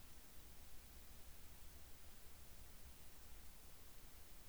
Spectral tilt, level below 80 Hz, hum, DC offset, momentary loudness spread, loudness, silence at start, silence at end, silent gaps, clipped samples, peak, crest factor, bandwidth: -3 dB/octave; -64 dBFS; none; 0.1%; 0 LU; -60 LUFS; 0 s; 0 s; none; under 0.1%; -44 dBFS; 12 dB; over 20 kHz